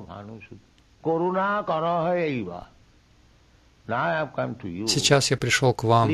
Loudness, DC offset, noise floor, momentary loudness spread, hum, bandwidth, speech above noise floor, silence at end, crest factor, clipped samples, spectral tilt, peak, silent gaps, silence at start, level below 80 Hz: -24 LUFS; under 0.1%; -57 dBFS; 19 LU; none; 14 kHz; 33 dB; 0 s; 18 dB; under 0.1%; -4.5 dB/octave; -6 dBFS; none; 0 s; -56 dBFS